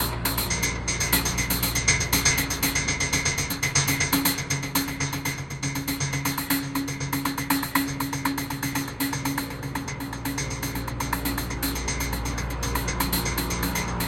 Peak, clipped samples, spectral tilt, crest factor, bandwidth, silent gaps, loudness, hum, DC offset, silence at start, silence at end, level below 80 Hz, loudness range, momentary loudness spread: -6 dBFS; under 0.1%; -3 dB/octave; 22 dB; 17 kHz; none; -25 LUFS; none; under 0.1%; 0 s; 0 s; -38 dBFS; 6 LU; 8 LU